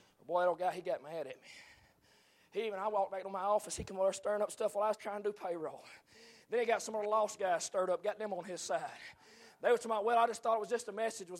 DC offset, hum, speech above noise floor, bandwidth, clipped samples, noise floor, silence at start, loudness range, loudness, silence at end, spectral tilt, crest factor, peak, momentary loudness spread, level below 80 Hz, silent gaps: under 0.1%; none; 32 dB; 15.5 kHz; under 0.1%; -68 dBFS; 0.3 s; 3 LU; -36 LUFS; 0 s; -3 dB/octave; 18 dB; -18 dBFS; 13 LU; -70 dBFS; none